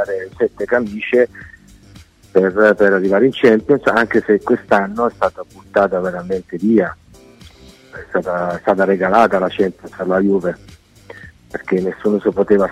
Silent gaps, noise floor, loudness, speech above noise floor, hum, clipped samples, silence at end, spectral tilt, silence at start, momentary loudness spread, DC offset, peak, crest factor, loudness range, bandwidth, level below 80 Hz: none; -43 dBFS; -16 LUFS; 28 dB; none; under 0.1%; 0 s; -7 dB/octave; 0 s; 11 LU; under 0.1%; 0 dBFS; 16 dB; 5 LU; 11.5 kHz; -50 dBFS